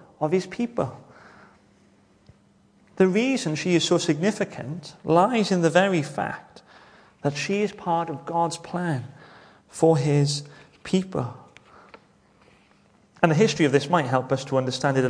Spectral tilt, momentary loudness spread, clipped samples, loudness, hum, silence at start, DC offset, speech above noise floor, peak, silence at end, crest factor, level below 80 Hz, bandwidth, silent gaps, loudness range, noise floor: -5.5 dB/octave; 12 LU; under 0.1%; -24 LUFS; none; 0.2 s; under 0.1%; 36 dB; 0 dBFS; 0 s; 24 dB; -64 dBFS; 10.5 kHz; none; 6 LU; -59 dBFS